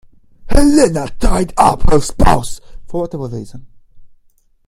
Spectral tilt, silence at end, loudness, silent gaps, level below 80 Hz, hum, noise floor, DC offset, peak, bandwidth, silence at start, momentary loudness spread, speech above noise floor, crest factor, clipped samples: -5.5 dB/octave; 0.6 s; -15 LUFS; none; -20 dBFS; none; -51 dBFS; under 0.1%; 0 dBFS; 12.5 kHz; 0.45 s; 17 LU; 40 dB; 12 dB; under 0.1%